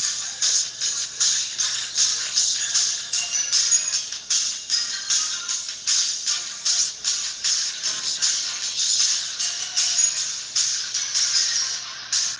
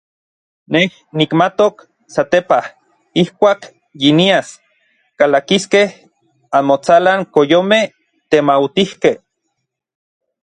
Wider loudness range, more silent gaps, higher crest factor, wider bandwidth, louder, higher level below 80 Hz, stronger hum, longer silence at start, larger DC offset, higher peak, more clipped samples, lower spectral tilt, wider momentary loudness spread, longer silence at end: about the same, 2 LU vs 2 LU; neither; about the same, 18 dB vs 16 dB; about the same, 11 kHz vs 10.5 kHz; second, -21 LUFS vs -14 LUFS; second, -70 dBFS vs -58 dBFS; neither; second, 0 s vs 0.7 s; neither; second, -6 dBFS vs 0 dBFS; neither; second, 4 dB/octave vs -5 dB/octave; about the same, 6 LU vs 8 LU; second, 0 s vs 1.25 s